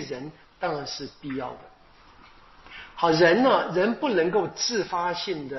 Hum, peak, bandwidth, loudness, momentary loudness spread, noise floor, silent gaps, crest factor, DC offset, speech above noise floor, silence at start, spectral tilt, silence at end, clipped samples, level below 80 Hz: none; -6 dBFS; 6.2 kHz; -24 LUFS; 21 LU; -53 dBFS; none; 20 dB; under 0.1%; 28 dB; 0 s; -3 dB/octave; 0 s; under 0.1%; -58 dBFS